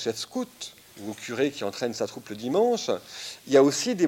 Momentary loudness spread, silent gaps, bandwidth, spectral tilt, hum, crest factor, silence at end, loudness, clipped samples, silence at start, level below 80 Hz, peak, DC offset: 17 LU; none; 17 kHz; -4 dB/octave; none; 18 dB; 0 s; -26 LUFS; under 0.1%; 0 s; -72 dBFS; -8 dBFS; under 0.1%